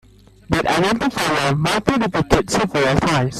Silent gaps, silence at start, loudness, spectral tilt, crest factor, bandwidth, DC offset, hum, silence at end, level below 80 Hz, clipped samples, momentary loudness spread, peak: none; 0.5 s; -18 LUFS; -5 dB/octave; 18 dB; 15 kHz; under 0.1%; none; 0 s; -38 dBFS; under 0.1%; 2 LU; 0 dBFS